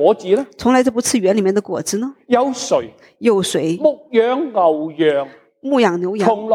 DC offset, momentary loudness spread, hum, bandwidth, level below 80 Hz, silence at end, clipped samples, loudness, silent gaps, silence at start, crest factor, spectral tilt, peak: under 0.1%; 7 LU; none; 16.5 kHz; -58 dBFS; 0 s; under 0.1%; -17 LUFS; none; 0 s; 16 dB; -4.5 dB/octave; -2 dBFS